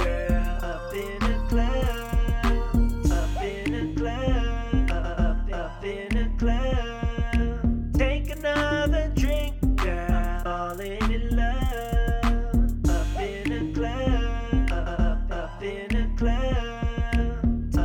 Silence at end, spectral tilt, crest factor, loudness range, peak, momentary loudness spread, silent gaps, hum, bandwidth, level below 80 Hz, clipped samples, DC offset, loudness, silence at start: 0 s; -6.5 dB/octave; 14 dB; 2 LU; -10 dBFS; 5 LU; none; none; 16 kHz; -26 dBFS; under 0.1%; under 0.1%; -27 LUFS; 0 s